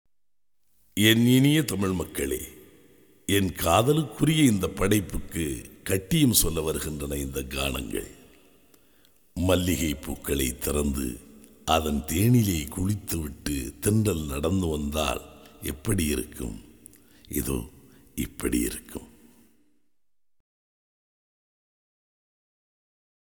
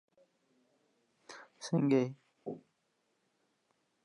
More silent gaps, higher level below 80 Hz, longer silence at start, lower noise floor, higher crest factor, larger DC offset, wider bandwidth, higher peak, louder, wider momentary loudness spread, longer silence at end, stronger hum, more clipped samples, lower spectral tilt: neither; first, -40 dBFS vs under -90 dBFS; second, 0.95 s vs 1.3 s; first, -88 dBFS vs -79 dBFS; about the same, 22 dB vs 22 dB; neither; first, 19.5 kHz vs 11.5 kHz; first, -4 dBFS vs -18 dBFS; first, -26 LUFS vs -32 LUFS; second, 15 LU vs 23 LU; first, 4.35 s vs 1.45 s; neither; neither; second, -4.5 dB/octave vs -7 dB/octave